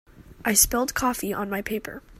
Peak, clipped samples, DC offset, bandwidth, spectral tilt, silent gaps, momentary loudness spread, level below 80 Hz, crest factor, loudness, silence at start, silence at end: -4 dBFS; under 0.1%; under 0.1%; 16 kHz; -2 dB/octave; none; 12 LU; -44 dBFS; 22 dB; -23 LUFS; 0.15 s; 0 s